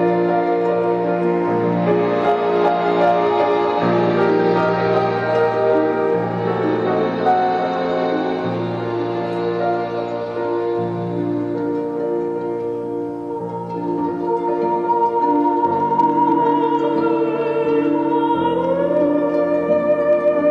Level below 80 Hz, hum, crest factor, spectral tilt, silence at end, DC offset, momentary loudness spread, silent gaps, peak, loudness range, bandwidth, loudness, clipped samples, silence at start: -58 dBFS; none; 10 dB; -8.5 dB/octave; 0 s; under 0.1%; 7 LU; none; -6 dBFS; 6 LU; 7 kHz; -18 LUFS; under 0.1%; 0 s